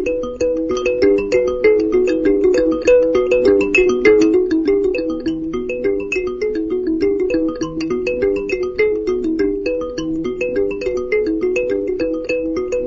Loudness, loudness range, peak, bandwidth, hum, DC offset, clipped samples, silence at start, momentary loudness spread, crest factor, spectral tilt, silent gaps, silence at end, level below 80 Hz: -17 LUFS; 6 LU; 0 dBFS; 7.6 kHz; none; under 0.1%; under 0.1%; 0 s; 8 LU; 16 dB; -5.5 dB/octave; none; 0 s; -40 dBFS